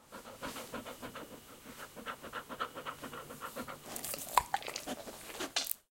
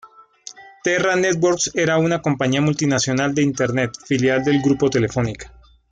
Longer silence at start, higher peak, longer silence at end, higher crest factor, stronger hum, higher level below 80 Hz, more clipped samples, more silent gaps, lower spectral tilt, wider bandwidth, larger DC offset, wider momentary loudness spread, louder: about the same, 0 s vs 0.05 s; about the same, -6 dBFS vs -6 dBFS; second, 0.15 s vs 0.45 s; first, 34 dB vs 14 dB; neither; second, -66 dBFS vs -50 dBFS; neither; neither; second, -1.5 dB/octave vs -5 dB/octave; first, 17 kHz vs 9.4 kHz; neither; first, 16 LU vs 9 LU; second, -40 LUFS vs -19 LUFS